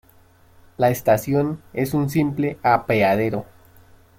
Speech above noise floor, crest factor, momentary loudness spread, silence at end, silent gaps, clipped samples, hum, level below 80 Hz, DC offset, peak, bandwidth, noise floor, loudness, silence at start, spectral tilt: 33 dB; 18 dB; 8 LU; 0.75 s; none; under 0.1%; none; -54 dBFS; under 0.1%; -4 dBFS; 17 kHz; -53 dBFS; -21 LUFS; 0.8 s; -7 dB/octave